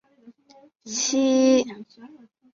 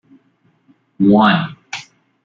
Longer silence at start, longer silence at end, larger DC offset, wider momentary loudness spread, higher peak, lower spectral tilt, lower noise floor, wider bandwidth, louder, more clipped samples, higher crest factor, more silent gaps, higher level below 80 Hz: second, 0.25 s vs 1 s; about the same, 0.45 s vs 0.4 s; neither; second, 15 LU vs 19 LU; second, -8 dBFS vs -2 dBFS; second, -2.5 dB/octave vs -6.5 dB/octave; second, -53 dBFS vs -59 dBFS; about the same, 7.6 kHz vs 7.4 kHz; second, -21 LUFS vs -14 LUFS; neither; about the same, 16 dB vs 16 dB; neither; second, -72 dBFS vs -56 dBFS